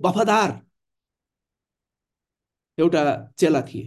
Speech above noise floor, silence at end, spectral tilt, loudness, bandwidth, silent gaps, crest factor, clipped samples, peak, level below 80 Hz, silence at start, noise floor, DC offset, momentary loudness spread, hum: 67 dB; 0 s; -5.5 dB/octave; -21 LUFS; 12.5 kHz; none; 18 dB; under 0.1%; -6 dBFS; -66 dBFS; 0 s; -88 dBFS; under 0.1%; 12 LU; none